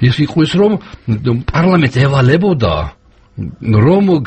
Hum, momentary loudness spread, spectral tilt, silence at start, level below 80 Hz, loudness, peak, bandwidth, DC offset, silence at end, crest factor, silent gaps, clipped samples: none; 11 LU; -8 dB/octave; 0 s; -32 dBFS; -12 LUFS; 0 dBFS; 8.6 kHz; under 0.1%; 0 s; 12 dB; none; under 0.1%